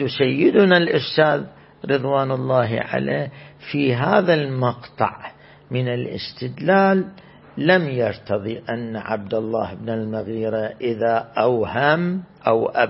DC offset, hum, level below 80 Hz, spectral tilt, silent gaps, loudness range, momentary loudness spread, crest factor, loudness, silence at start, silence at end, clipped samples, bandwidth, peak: under 0.1%; none; -58 dBFS; -11 dB/octave; none; 4 LU; 12 LU; 18 dB; -20 LUFS; 0 s; 0 s; under 0.1%; 5.8 kHz; -2 dBFS